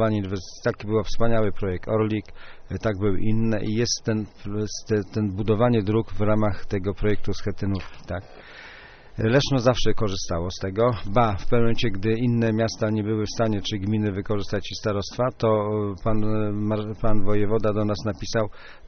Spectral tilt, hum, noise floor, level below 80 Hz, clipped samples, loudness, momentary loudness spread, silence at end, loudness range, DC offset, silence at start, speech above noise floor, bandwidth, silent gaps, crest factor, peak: -6 dB/octave; none; -44 dBFS; -34 dBFS; under 0.1%; -25 LUFS; 8 LU; 0 s; 3 LU; under 0.1%; 0 s; 23 dB; 6.6 kHz; none; 16 dB; -6 dBFS